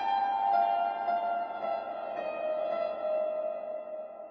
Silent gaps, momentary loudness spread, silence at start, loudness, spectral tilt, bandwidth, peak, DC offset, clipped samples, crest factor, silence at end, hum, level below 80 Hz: none; 11 LU; 0 s; -32 LUFS; -1 dB/octave; 6 kHz; -16 dBFS; under 0.1%; under 0.1%; 14 dB; 0 s; none; -76 dBFS